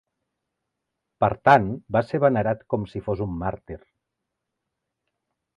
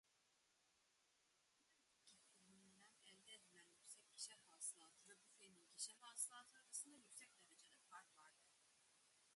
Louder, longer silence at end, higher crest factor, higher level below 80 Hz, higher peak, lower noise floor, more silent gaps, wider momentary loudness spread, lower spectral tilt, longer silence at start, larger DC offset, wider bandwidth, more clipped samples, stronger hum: first, -23 LUFS vs -56 LUFS; first, 1.8 s vs 0 s; second, 22 dB vs 28 dB; first, -50 dBFS vs under -90 dBFS; first, -4 dBFS vs -34 dBFS; about the same, -82 dBFS vs -83 dBFS; neither; second, 15 LU vs 18 LU; first, -8.5 dB/octave vs 1 dB/octave; first, 1.2 s vs 0.05 s; neither; about the same, 10.5 kHz vs 11.5 kHz; neither; neither